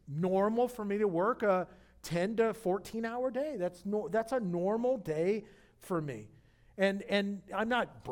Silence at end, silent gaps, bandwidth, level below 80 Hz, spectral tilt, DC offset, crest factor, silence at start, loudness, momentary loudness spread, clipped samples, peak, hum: 0 s; none; 18.5 kHz; -64 dBFS; -6.5 dB/octave; under 0.1%; 16 dB; 0.05 s; -33 LUFS; 8 LU; under 0.1%; -16 dBFS; none